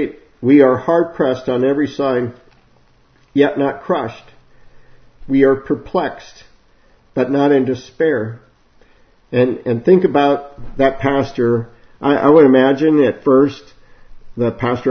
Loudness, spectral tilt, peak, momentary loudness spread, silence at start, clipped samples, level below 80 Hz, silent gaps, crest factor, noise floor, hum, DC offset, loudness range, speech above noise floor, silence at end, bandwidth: -15 LUFS; -8 dB/octave; 0 dBFS; 11 LU; 0 s; under 0.1%; -46 dBFS; none; 16 dB; -52 dBFS; none; under 0.1%; 7 LU; 38 dB; 0 s; 6.4 kHz